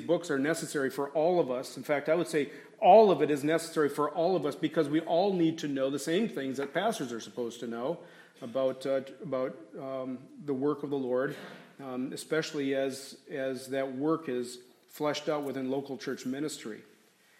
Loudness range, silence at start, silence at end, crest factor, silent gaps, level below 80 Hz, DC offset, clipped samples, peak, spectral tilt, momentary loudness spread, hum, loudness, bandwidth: 9 LU; 0 s; 0.55 s; 22 dB; none; -84 dBFS; under 0.1%; under 0.1%; -8 dBFS; -5 dB/octave; 11 LU; none; -31 LUFS; 16 kHz